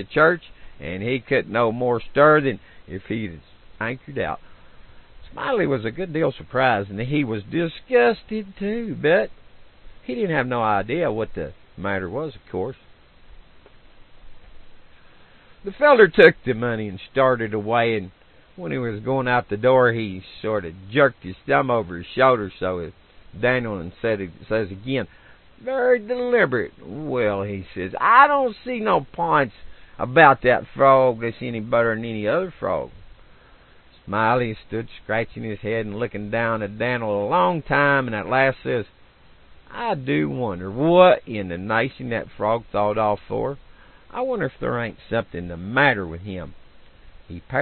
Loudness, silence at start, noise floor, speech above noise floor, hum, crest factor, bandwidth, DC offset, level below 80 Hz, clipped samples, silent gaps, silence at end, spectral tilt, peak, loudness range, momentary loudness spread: -21 LUFS; 0 s; -51 dBFS; 30 dB; none; 22 dB; 4.4 kHz; under 0.1%; -50 dBFS; under 0.1%; none; 0 s; -9.5 dB/octave; 0 dBFS; 8 LU; 16 LU